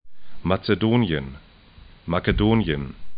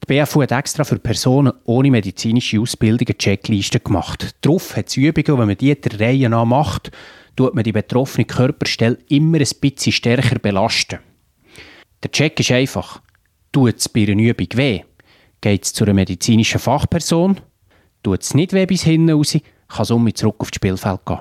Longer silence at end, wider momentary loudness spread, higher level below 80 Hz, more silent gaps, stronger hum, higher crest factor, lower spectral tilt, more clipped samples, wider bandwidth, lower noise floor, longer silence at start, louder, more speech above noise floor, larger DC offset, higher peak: about the same, 0 s vs 0 s; first, 11 LU vs 7 LU; first, -36 dBFS vs -44 dBFS; neither; neither; about the same, 20 dB vs 16 dB; first, -11.5 dB/octave vs -5.5 dB/octave; neither; second, 5.2 kHz vs 15.5 kHz; second, -48 dBFS vs -56 dBFS; about the same, 0.05 s vs 0 s; second, -23 LUFS vs -17 LUFS; second, 26 dB vs 40 dB; neither; second, -4 dBFS vs 0 dBFS